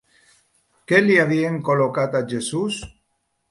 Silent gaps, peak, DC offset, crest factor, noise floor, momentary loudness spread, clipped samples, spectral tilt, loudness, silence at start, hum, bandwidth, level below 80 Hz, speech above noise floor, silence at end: none; 0 dBFS; under 0.1%; 20 dB; -71 dBFS; 10 LU; under 0.1%; -5.5 dB/octave; -20 LUFS; 0.9 s; none; 11.5 kHz; -54 dBFS; 52 dB; 0.6 s